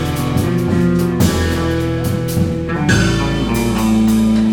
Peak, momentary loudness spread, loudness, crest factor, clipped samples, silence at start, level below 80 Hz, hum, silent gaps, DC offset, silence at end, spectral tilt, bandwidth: 0 dBFS; 5 LU; -15 LUFS; 14 dB; under 0.1%; 0 s; -28 dBFS; none; none; under 0.1%; 0 s; -6 dB/octave; 17.5 kHz